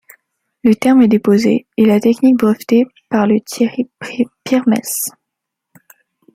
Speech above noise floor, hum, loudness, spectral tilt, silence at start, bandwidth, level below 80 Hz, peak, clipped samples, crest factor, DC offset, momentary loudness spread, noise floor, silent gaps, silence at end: 65 dB; none; -14 LUFS; -5.5 dB/octave; 0.65 s; 15.5 kHz; -58 dBFS; -2 dBFS; under 0.1%; 14 dB; under 0.1%; 10 LU; -78 dBFS; none; 1.25 s